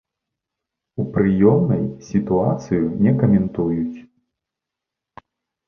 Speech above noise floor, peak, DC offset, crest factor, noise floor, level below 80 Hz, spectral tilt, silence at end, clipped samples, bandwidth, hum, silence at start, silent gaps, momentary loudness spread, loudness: 67 dB; -2 dBFS; under 0.1%; 18 dB; -85 dBFS; -46 dBFS; -10 dB/octave; 1.65 s; under 0.1%; 6.8 kHz; none; 1 s; none; 12 LU; -19 LUFS